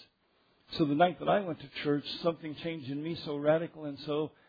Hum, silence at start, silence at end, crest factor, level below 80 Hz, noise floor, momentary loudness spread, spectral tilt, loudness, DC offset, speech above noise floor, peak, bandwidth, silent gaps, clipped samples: none; 0 s; 0.2 s; 18 dB; -68 dBFS; -71 dBFS; 12 LU; -4.5 dB/octave; -32 LUFS; under 0.1%; 39 dB; -14 dBFS; 5 kHz; none; under 0.1%